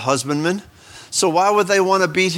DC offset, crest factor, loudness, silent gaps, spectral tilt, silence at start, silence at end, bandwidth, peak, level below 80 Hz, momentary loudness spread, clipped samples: under 0.1%; 16 dB; -17 LUFS; none; -3.5 dB/octave; 0 s; 0 s; 16.5 kHz; -2 dBFS; -60 dBFS; 8 LU; under 0.1%